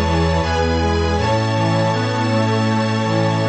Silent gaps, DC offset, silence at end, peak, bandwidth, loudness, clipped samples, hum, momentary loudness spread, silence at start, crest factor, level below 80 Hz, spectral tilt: none; under 0.1%; 0 s; -4 dBFS; 8.6 kHz; -18 LUFS; under 0.1%; none; 1 LU; 0 s; 12 dB; -30 dBFS; -6 dB/octave